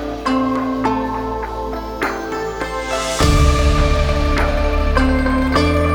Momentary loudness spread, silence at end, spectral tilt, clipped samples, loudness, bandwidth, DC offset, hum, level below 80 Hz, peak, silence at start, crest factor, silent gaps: 9 LU; 0 s; -5.5 dB/octave; under 0.1%; -18 LUFS; 19 kHz; under 0.1%; none; -20 dBFS; 0 dBFS; 0 s; 16 dB; none